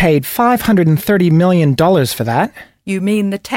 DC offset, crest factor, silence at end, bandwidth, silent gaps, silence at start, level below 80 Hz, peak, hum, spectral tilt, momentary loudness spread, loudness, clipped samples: under 0.1%; 12 dB; 0 s; 16.5 kHz; none; 0 s; -42 dBFS; -2 dBFS; none; -6.5 dB/octave; 8 LU; -13 LUFS; under 0.1%